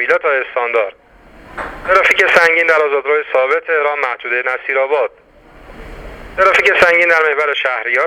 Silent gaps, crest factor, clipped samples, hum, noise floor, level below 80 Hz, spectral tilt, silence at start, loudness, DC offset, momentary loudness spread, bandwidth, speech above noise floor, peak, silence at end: none; 14 dB; under 0.1%; none; -40 dBFS; -44 dBFS; -2.5 dB/octave; 0 s; -13 LUFS; under 0.1%; 16 LU; 17 kHz; 27 dB; 0 dBFS; 0 s